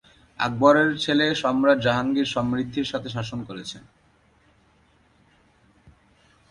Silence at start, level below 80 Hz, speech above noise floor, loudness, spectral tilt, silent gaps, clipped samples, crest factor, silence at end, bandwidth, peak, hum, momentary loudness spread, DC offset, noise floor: 0.4 s; -56 dBFS; 38 dB; -22 LUFS; -5.5 dB/octave; none; under 0.1%; 22 dB; 2.7 s; 11 kHz; -4 dBFS; none; 16 LU; under 0.1%; -60 dBFS